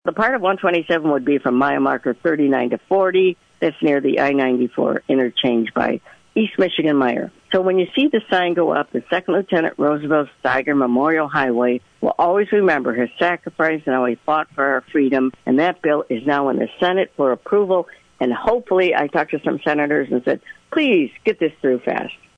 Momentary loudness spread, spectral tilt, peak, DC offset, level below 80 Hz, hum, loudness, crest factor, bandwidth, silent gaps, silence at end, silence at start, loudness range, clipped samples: 5 LU; -7 dB/octave; -4 dBFS; under 0.1%; -58 dBFS; none; -18 LUFS; 14 dB; 7.4 kHz; none; 0.25 s; 0.05 s; 1 LU; under 0.1%